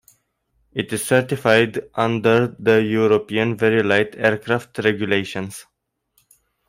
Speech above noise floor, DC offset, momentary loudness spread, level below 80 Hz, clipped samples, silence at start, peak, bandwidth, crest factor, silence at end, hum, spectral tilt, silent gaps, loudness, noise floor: 48 dB; under 0.1%; 11 LU; -60 dBFS; under 0.1%; 0.75 s; -2 dBFS; 16 kHz; 18 dB; 1.05 s; none; -5.5 dB/octave; none; -19 LUFS; -67 dBFS